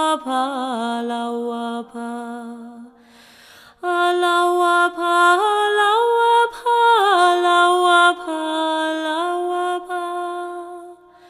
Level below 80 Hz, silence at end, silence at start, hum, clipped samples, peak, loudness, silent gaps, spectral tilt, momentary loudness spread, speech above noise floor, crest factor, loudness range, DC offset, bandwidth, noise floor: -70 dBFS; 0.35 s; 0 s; 60 Hz at -75 dBFS; under 0.1%; -2 dBFS; -18 LUFS; none; -2 dB/octave; 15 LU; 24 dB; 16 dB; 11 LU; under 0.1%; 15.5 kHz; -48 dBFS